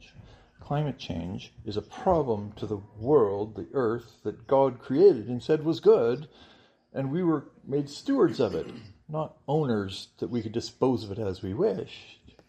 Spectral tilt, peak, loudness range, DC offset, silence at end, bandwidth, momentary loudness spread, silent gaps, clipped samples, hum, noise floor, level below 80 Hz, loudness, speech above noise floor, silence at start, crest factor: -7.5 dB/octave; -8 dBFS; 5 LU; under 0.1%; 0.35 s; 8.8 kHz; 15 LU; none; under 0.1%; none; -52 dBFS; -58 dBFS; -28 LUFS; 25 dB; 0.2 s; 20 dB